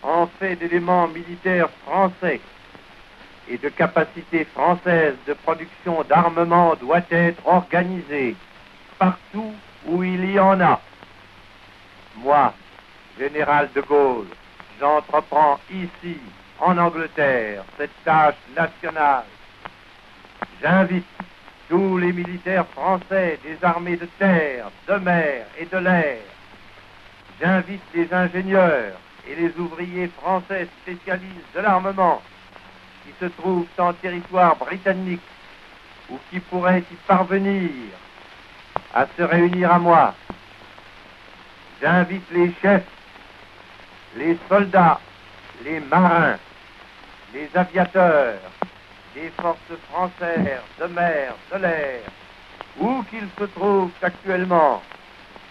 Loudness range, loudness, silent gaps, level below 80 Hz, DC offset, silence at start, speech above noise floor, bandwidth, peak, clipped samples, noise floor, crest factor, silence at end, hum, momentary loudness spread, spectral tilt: 4 LU; -20 LUFS; none; -56 dBFS; under 0.1%; 0 s; 27 dB; 6.2 kHz; -2 dBFS; under 0.1%; -47 dBFS; 18 dB; 0.65 s; none; 15 LU; -8.5 dB/octave